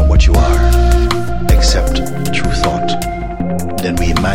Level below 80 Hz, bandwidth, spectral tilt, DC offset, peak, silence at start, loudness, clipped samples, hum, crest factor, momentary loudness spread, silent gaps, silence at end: -14 dBFS; 16 kHz; -5.5 dB/octave; under 0.1%; 0 dBFS; 0 s; -14 LUFS; under 0.1%; none; 12 dB; 8 LU; none; 0 s